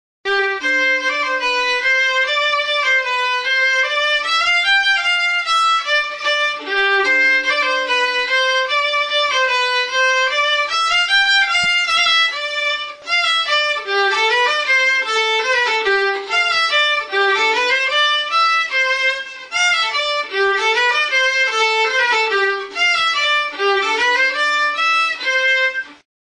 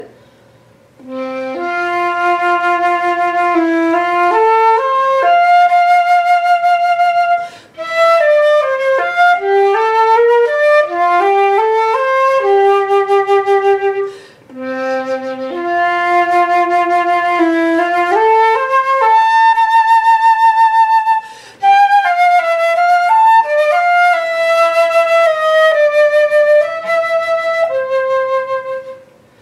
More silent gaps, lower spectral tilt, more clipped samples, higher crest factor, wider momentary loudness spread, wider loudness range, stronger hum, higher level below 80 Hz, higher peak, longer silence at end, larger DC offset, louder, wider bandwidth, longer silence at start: neither; second, 1 dB/octave vs -3 dB/octave; neither; about the same, 12 dB vs 10 dB; second, 4 LU vs 8 LU; second, 1 LU vs 4 LU; neither; first, -58 dBFS vs -66 dBFS; second, -6 dBFS vs -2 dBFS; about the same, 0.45 s vs 0.45 s; neither; second, -15 LUFS vs -12 LUFS; second, 10.5 kHz vs 13 kHz; first, 0.25 s vs 0 s